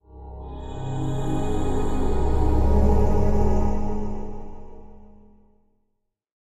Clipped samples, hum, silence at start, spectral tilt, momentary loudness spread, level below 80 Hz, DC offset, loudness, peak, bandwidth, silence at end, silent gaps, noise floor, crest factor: under 0.1%; none; 0.15 s; -8.5 dB/octave; 18 LU; -24 dBFS; under 0.1%; -25 LUFS; -8 dBFS; 8 kHz; 1.4 s; none; -74 dBFS; 14 dB